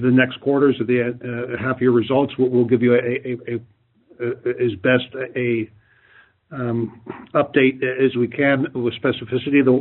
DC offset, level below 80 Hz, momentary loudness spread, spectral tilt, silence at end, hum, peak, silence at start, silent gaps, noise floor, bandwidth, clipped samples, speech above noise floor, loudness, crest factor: under 0.1%; -62 dBFS; 11 LU; -5.5 dB/octave; 0 s; none; -2 dBFS; 0 s; none; -53 dBFS; 4.2 kHz; under 0.1%; 34 dB; -20 LUFS; 18 dB